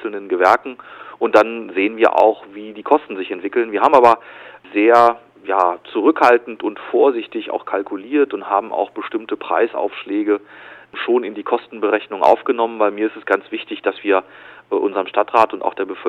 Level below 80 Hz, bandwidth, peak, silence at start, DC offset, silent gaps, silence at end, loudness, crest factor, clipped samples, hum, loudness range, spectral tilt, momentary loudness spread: -66 dBFS; 10.5 kHz; 0 dBFS; 0 s; under 0.1%; none; 0 s; -17 LUFS; 18 dB; 0.2%; none; 6 LU; -5 dB/octave; 12 LU